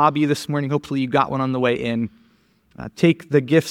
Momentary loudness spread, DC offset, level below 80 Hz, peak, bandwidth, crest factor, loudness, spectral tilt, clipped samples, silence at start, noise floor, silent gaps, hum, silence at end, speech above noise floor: 9 LU; under 0.1%; -56 dBFS; -2 dBFS; 16 kHz; 18 dB; -20 LUFS; -6.5 dB/octave; under 0.1%; 0 s; -59 dBFS; none; none; 0 s; 39 dB